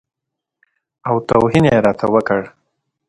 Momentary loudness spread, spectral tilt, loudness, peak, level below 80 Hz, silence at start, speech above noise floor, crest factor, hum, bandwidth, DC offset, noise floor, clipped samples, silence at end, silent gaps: 11 LU; -7.5 dB/octave; -15 LUFS; 0 dBFS; -46 dBFS; 1.05 s; 56 dB; 18 dB; none; 11.5 kHz; under 0.1%; -70 dBFS; under 0.1%; 0.6 s; none